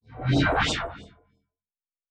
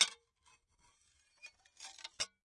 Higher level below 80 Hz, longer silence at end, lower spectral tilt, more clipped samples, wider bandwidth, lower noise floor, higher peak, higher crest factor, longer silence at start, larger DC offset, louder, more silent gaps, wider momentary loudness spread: first, -42 dBFS vs -82 dBFS; first, 1.05 s vs 0.2 s; first, -5 dB/octave vs 2.5 dB/octave; neither; second, 10 kHz vs 11.5 kHz; first, under -90 dBFS vs -73 dBFS; about the same, -10 dBFS vs -12 dBFS; second, 18 dB vs 30 dB; about the same, 0.1 s vs 0 s; neither; first, -24 LUFS vs -40 LUFS; neither; second, 16 LU vs 19 LU